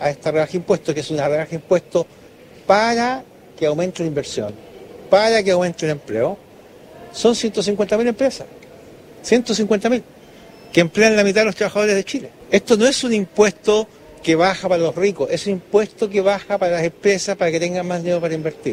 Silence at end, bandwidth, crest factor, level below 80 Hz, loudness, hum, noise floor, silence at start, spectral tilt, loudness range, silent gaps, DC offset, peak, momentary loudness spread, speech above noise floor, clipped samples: 0 s; 15 kHz; 18 dB; -54 dBFS; -18 LUFS; none; -43 dBFS; 0 s; -4.5 dB/octave; 4 LU; none; under 0.1%; 0 dBFS; 10 LU; 25 dB; under 0.1%